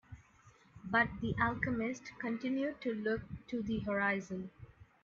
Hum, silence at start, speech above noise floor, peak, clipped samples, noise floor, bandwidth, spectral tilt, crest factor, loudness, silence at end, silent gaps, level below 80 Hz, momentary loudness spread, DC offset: none; 0.1 s; 28 dB; -16 dBFS; under 0.1%; -64 dBFS; 7.4 kHz; -6.5 dB/octave; 20 dB; -36 LUFS; 0.2 s; none; -60 dBFS; 12 LU; under 0.1%